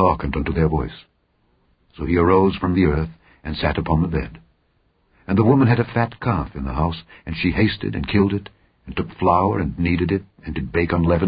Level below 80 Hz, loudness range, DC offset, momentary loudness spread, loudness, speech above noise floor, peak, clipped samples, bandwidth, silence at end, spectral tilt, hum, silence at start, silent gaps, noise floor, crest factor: -32 dBFS; 2 LU; under 0.1%; 14 LU; -20 LUFS; 44 dB; -2 dBFS; under 0.1%; 5.2 kHz; 0 s; -12.5 dB/octave; none; 0 s; none; -64 dBFS; 18 dB